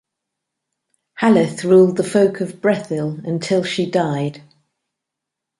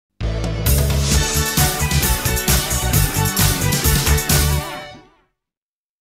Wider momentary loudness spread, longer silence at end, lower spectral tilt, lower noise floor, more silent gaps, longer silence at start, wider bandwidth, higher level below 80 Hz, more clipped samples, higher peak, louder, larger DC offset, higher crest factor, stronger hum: first, 11 LU vs 8 LU; first, 1.2 s vs 1.05 s; first, -6.5 dB/octave vs -3.5 dB/octave; second, -82 dBFS vs under -90 dBFS; neither; first, 1.15 s vs 0.2 s; second, 11.5 kHz vs 16.5 kHz; second, -62 dBFS vs -24 dBFS; neither; about the same, 0 dBFS vs -2 dBFS; about the same, -17 LUFS vs -17 LUFS; neither; about the same, 18 dB vs 16 dB; neither